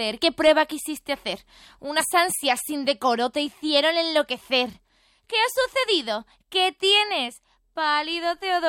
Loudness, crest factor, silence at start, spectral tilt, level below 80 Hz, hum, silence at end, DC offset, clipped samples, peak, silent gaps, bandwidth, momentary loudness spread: -23 LUFS; 18 dB; 0 s; -1 dB/octave; -62 dBFS; none; 0 s; under 0.1%; under 0.1%; -6 dBFS; none; 17 kHz; 12 LU